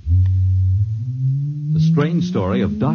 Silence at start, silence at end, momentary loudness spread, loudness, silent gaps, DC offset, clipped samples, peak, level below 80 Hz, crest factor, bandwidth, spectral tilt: 0.05 s; 0 s; 5 LU; -18 LUFS; none; under 0.1%; under 0.1%; -6 dBFS; -34 dBFS; 12 dB; 6.6 kHz; -9 dB/octave